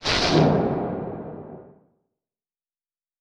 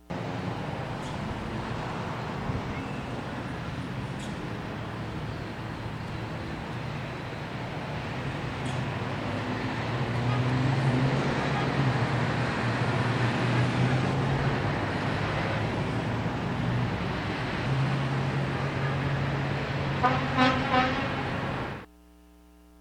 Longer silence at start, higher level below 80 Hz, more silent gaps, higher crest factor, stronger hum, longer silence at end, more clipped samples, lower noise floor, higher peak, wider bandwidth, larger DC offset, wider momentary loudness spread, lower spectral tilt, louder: about the same, 0 s vs 0.1 s; about the same, -46 dBFS vs -46 dBFS; neither; about the same, 20 dB vs 22 dB; neither; first, 1.55 s vs 0.95 s; neither; first, under -90 dBFS vs -54 dBFS; about the same, -6 dBFS vs -8 dBFS; about the same, 10.5 kHz vs 10.5 kHz; neither; first, 21 LU vs 10 LU; about the same, -5.5 dB/octave vs -6.5 dB/octave; first, -22 LUFS vs -29 LUFS